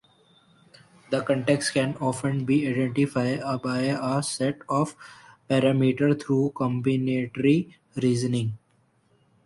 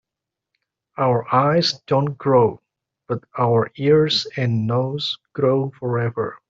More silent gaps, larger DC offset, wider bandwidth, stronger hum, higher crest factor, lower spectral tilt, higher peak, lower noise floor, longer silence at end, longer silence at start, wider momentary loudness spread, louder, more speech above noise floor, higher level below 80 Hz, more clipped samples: neither; neither; first, 11.5 kHz vs 7.6 kHz; neither; about the same, 18 dB vs 18 dB; about the same, -6 dB/octave vs -6.5 dB/octave; second, -8 dBFS vs -4 dBFS; second, -65 dBFS vs -85 dBFS; first, 0.9 s vs 0.15 s; about the same, 1.1 s vs 1 s; about the same, 6 LU vs 8 LU; second, -25 LUFS vs -20 LUFS; second, 41 dB vs 66 dB; about the same, -62 dBFS vs -60 dBFS; neither